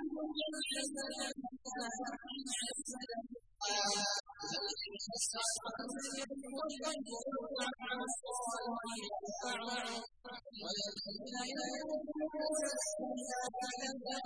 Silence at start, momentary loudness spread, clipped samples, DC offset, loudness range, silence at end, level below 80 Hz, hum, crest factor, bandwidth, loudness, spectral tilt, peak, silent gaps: 0 s; 7 LU; under 0.1%; under 0.1%; 3 LU; 0 s; -76 dBFS; none; 18 dB; 11 kHz; -40 LUFS; -1 dB/octave; -24 dBFS; none